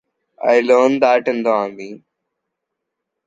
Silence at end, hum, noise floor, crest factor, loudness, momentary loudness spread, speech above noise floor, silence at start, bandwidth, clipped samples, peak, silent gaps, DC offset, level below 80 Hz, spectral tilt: 1.3 s; none; -79 dBFS; 18 dB; -16 LUFS; 16 LU; 63 dB; 0.4 s; 7.8 kHz; under 0.1%; 0 dBFS; none; under 0.1%; -70 dBFS; -5 dB/octave